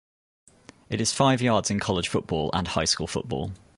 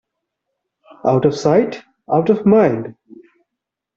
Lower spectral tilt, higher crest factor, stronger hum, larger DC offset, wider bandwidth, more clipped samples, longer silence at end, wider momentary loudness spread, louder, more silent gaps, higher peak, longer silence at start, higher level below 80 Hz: second, -4 dB/octave vs -7.5 dB/octave; about the same, 20 dB vs 16 dB; neither; neither; first, 11.5 kHz vs 7.8 kHz; neither; second, 0.2 s vs 1.05 s; second, 9 LU vs 13 LU; second, -25 LUFS vs -16 LUFS; neither; second, -8 dBFS vs -2 dBFS; second, 0.9 s vs 1.05 s; first, -46 dBFS vs -56 dBFS